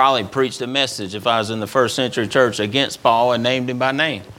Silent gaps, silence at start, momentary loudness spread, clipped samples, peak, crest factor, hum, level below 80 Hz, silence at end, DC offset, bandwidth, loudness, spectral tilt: none; 0 s; 5 LU; under 0.1%; 0 dBFS; 18 dB; none; -58 dBFS; 0.05 s; under 0.1%; 17 kHz; -18 LUFS; -4 dB/octave